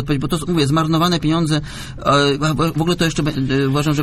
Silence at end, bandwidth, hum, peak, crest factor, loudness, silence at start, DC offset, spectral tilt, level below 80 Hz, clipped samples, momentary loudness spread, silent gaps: 0 s; 14.5 kHz; none; -2 dBFS; 14 dB; -17 LUFS; 0 s; under 0.1%; -5.5 dB/octave; -36 dBFS; under 0.1%; 5 LU; none